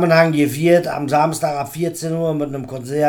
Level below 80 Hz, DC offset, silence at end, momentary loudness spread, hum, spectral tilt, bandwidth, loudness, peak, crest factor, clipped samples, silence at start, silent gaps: -56 dBFS; under 0.1%; 0 s; 10 LU; none; -6 dB/octave; 19 kHz; -18 LUFS; 0 dBFS; 16 dB; under 0.1%; 0 s; none